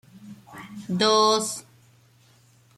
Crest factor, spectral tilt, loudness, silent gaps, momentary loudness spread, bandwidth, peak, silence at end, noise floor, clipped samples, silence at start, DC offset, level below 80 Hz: 20 dB; -3 dB/octave; -21 LUFS; none; 24 LU; 15 kHz; -8 dBFS; 1.15 s; -58 dBFS; under 0.1%; 0.15 s; under 0.1%; -70 dBFS